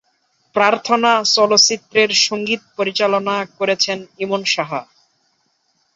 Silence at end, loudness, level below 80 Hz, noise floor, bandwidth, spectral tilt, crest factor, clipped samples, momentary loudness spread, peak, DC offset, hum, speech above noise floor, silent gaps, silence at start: 1.15 s; -16 LUFS; -66 dBFS; -64 dBFS; 8 kHz; -1.5 dB/octave; 18 dB; under 0.1%; 10 LU; 0 dBFS; under 0.1%; none; 48 dB; none; 0.55 s